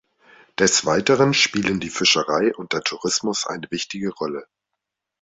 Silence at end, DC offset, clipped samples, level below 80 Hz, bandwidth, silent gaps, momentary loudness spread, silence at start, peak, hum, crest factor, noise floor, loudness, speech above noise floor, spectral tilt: 0.8 s; under 0.1%; under 0.1%; -58 dBFS; 8.4 kHz; none; 11 LU; 0.6 s; -2 dBFS; none; 20 dB; -82 dBFS; -20 LUFS; 61 dB; -3 dB/octave